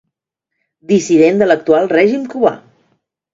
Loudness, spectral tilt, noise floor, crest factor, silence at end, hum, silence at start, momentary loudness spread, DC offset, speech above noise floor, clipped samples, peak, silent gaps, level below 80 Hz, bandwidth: -13 LUFS; -5.5 dB/octave; -77 dBFS; 14 dB; 0.75 s; none; 0.9 s; 6 LU; under 0.1%; 65 dB; under 0.1%; 0 dBFS; none; -58 dBFS; 7.8 kHz